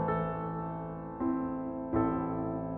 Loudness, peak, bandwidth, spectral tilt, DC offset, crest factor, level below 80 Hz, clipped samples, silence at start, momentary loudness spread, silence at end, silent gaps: -34 LUFS; -16 dBFS; 3.8 kHz; -9.5 dB/octave; under 0.1%; 18 dB; -52 dBFS; under 0.1%; 0 s; 7 LU; 0 s; none